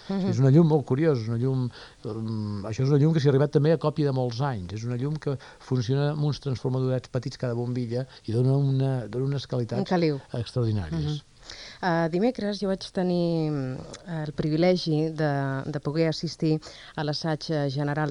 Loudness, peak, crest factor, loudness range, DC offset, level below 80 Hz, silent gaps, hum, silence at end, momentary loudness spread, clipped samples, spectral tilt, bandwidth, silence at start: -26 LUFS; -8 dBFS; 16 dB; 4 LU; under 0.1%; -54 dBFS; none; none; 0 s; 11 LU; under 0.1%; -7.5 dB/octave; 10 kHz; 0 s